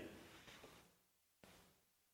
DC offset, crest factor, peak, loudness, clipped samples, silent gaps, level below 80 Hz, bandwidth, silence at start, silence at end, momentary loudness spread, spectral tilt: under 0.1%; 20 dB; -42 dBFS; -62 LUFS; under 0.1%; none; -80 dBFS; 19 kHz; 0 s; 0 s; 9 LU; -3.5 dB/octave